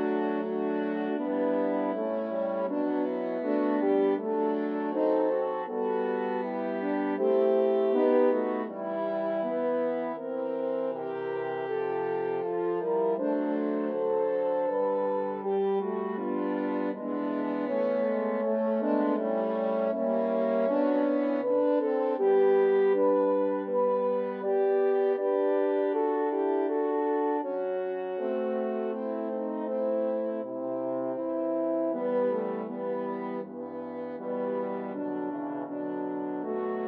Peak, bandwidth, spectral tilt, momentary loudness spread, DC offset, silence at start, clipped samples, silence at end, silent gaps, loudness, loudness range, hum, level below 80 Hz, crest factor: -14 dBFS; 4.7 kHz; -6 dB/octave; 8 LU; under 0.1%; 0 s; under 0.1%; 0 s; none; -29 LUFS; 6 LU; none; under -90 dBFS; 14 dB